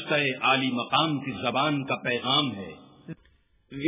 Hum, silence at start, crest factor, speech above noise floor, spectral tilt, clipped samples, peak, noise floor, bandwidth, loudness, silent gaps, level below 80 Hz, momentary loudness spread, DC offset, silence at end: none; 0 s; 18 dB; 37 dB; -2.5 dB/octave; under 0.1%; -10 dBFS; -63 dBFS; 3.9 kHz; -25 LUFS; none; -64 dBFS; 22 LU; under 0.1%; 0 s